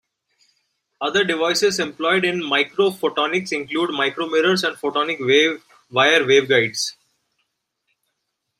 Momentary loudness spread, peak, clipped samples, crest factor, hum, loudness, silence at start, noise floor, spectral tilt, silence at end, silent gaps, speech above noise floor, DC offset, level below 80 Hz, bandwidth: 8 LU; -2 dBFS; under 0.1%; 18 dB; none; -19 LUFS; 1 s; -76 dBFS; -3 dB/octave; 1.7 s; none; 57 dB; under 0.1%; -68 dBFS; 16 kHz